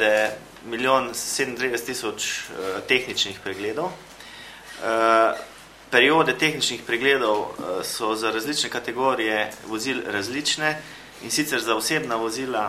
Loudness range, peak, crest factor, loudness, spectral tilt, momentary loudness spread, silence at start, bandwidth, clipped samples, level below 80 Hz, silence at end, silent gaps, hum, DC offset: 5 LU; -2 dBFS; 22 dB; -23 LUFS; -2.5 dB/octave; 14 LU; 0 s; 16 kHz; under 0.1%; -60 dBFS; 0 s; none; none; under 0.1%